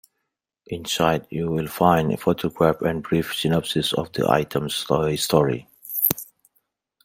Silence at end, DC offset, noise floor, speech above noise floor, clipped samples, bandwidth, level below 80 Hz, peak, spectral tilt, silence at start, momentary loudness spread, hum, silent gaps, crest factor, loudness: 0.8 s; under 0.1%; -80 dBFS; 58 dB; under 0.1%; 16.5 kHz; -52 dBFS; 0 dBFS; -5 dB/octave; 0.7 s; 8 LU; none; none; 22 dB; -22 LUFS